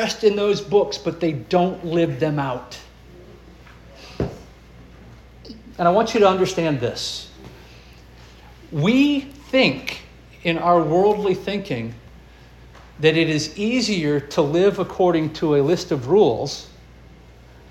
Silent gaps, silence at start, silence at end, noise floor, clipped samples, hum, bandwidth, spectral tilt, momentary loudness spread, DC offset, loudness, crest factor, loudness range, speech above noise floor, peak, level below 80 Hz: none; 0 s; 1.05 s; -45 dBFS; under 0.1%; none; 13.5 kHz; -5.5 dB/octave; 14 LU; under 0.1%; -20 LUFS; 20 dB; 7 LU; 26 dB; -2 dBFS; -48 dBFS